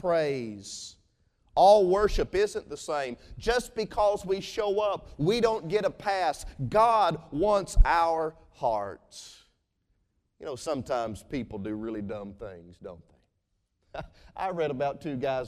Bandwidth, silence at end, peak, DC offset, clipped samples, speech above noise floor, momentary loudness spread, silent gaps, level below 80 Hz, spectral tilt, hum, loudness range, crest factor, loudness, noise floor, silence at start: 14 kHz; 0 s; -8 dBFS; under 0.1%; under 0.1%; 50 dB; 21 LU; none; -36 dBFS; -5 dB/octave; none; 11 LU; 20 dB; -28 LUFS; -77 dBFS; 0.05 s